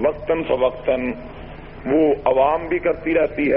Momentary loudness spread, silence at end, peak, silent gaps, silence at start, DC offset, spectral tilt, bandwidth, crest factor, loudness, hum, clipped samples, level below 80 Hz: 16 LU; 0 s; -4 dBFS; none; 0 s; under 0.1%; -5 dB/octave; 5.2 kHz; 16 dB; -20 LUFS; none; under 0.1%; -42 dBFS